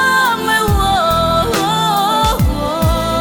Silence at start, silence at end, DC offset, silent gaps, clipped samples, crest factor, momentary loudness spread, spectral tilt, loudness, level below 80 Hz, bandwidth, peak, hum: 0 s; 0 s; under 0.1%; none; under 0.1%; 10 dB; 3 LU; -4.5 dB/octave; -14 LUFS; -24 dBFS; over 20 kHz; -4 dBFS; none